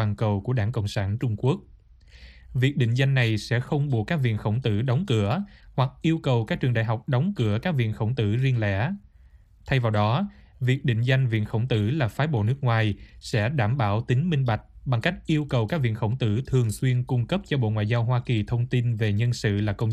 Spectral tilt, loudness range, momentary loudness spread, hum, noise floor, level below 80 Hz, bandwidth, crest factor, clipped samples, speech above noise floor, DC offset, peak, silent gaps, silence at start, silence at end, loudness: -7 dB/octave; 1 LU; 4 LU; none; -53 dBFS; -48 dBFS; 12 kHz; 18 dB; under 0.1%; 29 dB; under 0.1%; -6 dBFS; none; 0 s; 0 s; -25 LUFS